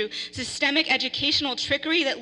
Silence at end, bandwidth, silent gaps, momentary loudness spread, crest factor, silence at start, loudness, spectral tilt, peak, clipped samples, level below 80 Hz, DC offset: 0 s; 11.5 kHz; none; 9 LU; 18 dB; 0 s; -23 LUFS; -2 dB/octave; -8 dBFS; under 0.1%; -56 dBFS; under 0.1%